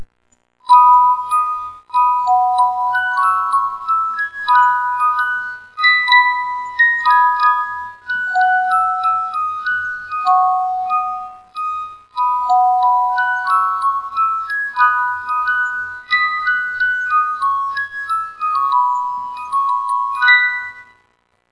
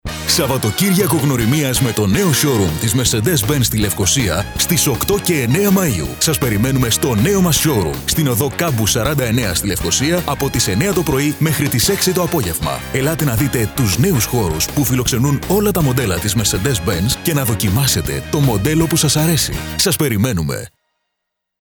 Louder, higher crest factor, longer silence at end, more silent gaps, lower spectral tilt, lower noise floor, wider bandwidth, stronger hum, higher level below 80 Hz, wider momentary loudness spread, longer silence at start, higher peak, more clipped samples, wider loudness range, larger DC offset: about the same, -15 LUFS vs -15 LUFS; about the same, 16 dB vs 16 dB; second, 0.7 s vs 0.95 s; neither; second, -0.5 dB/octave vs -4 dB/octave; second, -62 dBFS vs -77 dBFS; second, 11 kHz vs over 20 kHz; neither; second, -62 dBFS vs -32 dBFS; first, 12 LU vs 4 LU; about the same, 0 s vs 0.05 s; about the same, 0 dBFS vs 0 dBFS; neither; first, 4 LU vs 1 LU; neither